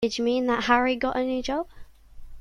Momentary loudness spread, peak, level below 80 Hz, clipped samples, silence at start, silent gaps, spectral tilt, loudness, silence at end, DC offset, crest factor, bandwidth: 9 LU; -6 dBFS; -48 dBFS; under 0.1%; 0 s; none; -4 dB/octave; -25 LUFS; 0 s; under 0.1%; 20 dB; 11 kHz